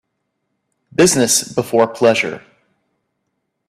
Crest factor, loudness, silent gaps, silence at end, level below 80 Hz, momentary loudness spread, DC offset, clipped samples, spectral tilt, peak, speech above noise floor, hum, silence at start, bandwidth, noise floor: 18 dB; -15 LUFS; none; 1.3 s; -56 dBFS; 11 LU; under 0.1%; under 0.1%; -3 dB/octave; 0 dBFS; 58 dB; none; 1 s; 15.5 kHz; -72 dBFS